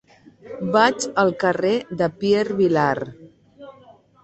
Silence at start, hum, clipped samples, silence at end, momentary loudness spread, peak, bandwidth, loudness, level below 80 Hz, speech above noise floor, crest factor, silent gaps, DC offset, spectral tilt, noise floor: 0.45 s; none; under 0.1%; 0.5 s; 11 LU; -2 dBFS; 8.4 kHz; -20 LUFS; -60 dBFS; 30 dB; 18 dB; none; under 0.1%; -5 dB/octave; -50 dBFS